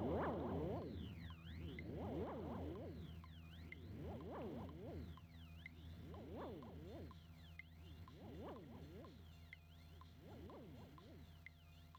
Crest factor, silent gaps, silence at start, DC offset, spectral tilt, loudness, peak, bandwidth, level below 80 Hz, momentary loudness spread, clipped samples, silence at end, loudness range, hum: 20 dB; none; 0 s; under 0.1%; -8 dB/octave; -53 LUFS; -32 dBFS; 18 kHz; -62 dBFS; 14 LU; under 0.1%; 0 s; 9 LU; none